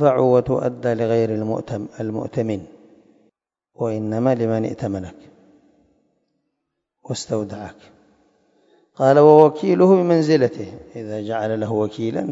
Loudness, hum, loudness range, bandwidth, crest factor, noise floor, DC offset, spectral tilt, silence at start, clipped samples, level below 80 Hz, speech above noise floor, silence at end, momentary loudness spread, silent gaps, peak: -19 LUFS; none; 17 LU; 8 kHz; 20 dB; -78 dBFS; under 0.1%; -7.5 dB/octave; 0 s; under 0.1%; -58 dBFS; 59 dB; 0 s; 17 LU; none; 0 dBFS